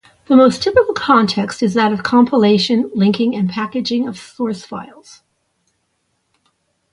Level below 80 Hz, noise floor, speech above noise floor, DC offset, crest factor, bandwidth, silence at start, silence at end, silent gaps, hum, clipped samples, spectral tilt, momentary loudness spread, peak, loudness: -52 dBFS; -67 dBFS; 53 dB; under 0.1%; 16 dB; 11 kHz; 0.3 s; 2.05 s; none; none; under 0.1%; -6 dB/octave; 12 LU; 0 dBFS; -15 LUFS